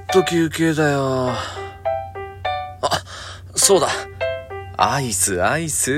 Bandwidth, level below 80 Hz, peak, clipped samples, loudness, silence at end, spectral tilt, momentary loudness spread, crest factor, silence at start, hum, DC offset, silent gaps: 16.5 kHz; -46 dBFS; 0 dBFS; under 0.1%; -20 LUFS; 0 s; -3.5 dB/octave; 13 LU; 20 dB; 0 s; none; under 0.1%; none